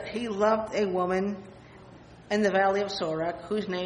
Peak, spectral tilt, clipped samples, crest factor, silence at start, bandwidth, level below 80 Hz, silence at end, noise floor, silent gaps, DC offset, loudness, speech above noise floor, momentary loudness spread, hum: -12 dBFS; -5.5 dB/octave; under 0.1%; 16 dB; 0 s; 10 kHz; -60 dBFS; 0 s; -50 dBFS; none; under 0.1%; -27 LUFS; 22 dB; 9 LU; none